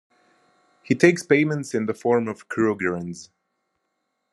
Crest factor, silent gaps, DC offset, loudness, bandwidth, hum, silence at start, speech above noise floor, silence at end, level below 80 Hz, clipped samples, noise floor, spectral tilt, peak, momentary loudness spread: 24 dB; none; under 0.1%; -22 LUFS; 12 kHz; none; 0.9 s; 54 dB; 1.1 s; -68 dBFS; under 0.1%; -76 dBFS; -6 dB/octave; 0 dBFS; 12 LU